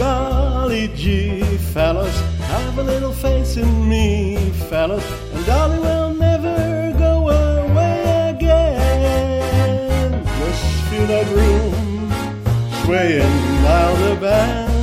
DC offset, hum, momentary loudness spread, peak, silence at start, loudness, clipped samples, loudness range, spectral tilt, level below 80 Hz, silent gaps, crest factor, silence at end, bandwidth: under 0.1%; none; 6 LU; -2 dBFS; 0 s; -17 LUFS; under 0.1%; 3 LU; -6.5 dB/octave; -20 dBFS; none; 14 dB; 0 s; 16 kHz